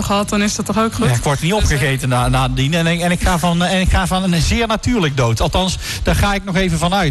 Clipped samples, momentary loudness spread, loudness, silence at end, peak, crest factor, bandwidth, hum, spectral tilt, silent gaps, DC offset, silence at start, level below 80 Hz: under 0.1%; 2 LU; -16 LUFS; 0 s; -6 dBFS; 10 dB; 12.5 kHz; none; -5 dB/octave; none; under 0.1%; 0 s; -24 dBFS